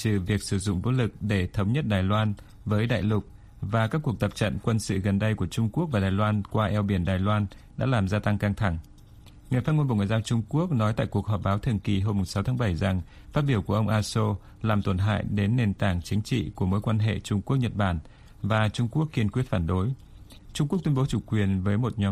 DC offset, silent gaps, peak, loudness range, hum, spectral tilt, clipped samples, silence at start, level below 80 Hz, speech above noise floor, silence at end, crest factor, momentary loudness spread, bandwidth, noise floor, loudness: under 0.1%; none; -10 dBFS; 1 LU; none; -7 dB/octave; under 0.1%; 0 s; -46 dBFS; 24 dB; 0 s; 16 dB; 5 LU; 13.5 kHz; -49 dBFS; -27 LUFS